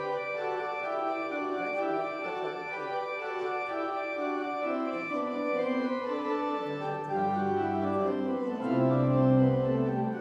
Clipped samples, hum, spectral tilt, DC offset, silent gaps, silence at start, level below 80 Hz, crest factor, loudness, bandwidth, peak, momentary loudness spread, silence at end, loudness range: under 0.1%; none; -8.5 dB/octave; under 0.1%; none; 0 s; -66 dBFS; 16 dB; -30 LUFS; 7.4 kHz; -14 dBFS; 8 LU; 0 s; 5 LU